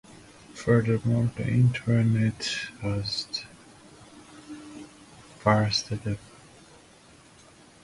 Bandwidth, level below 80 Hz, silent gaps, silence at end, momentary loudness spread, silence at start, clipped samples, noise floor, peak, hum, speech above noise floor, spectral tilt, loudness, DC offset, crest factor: 11.5 kHz; -54 dBFS; none; 1.65 s; 22 LU; 0.1 s; under 0.1%; -54 dBFS; -6 dBFS; none; 29 dB; -6 dB/octave; -26 LUFS; under 0.1%; 22 dB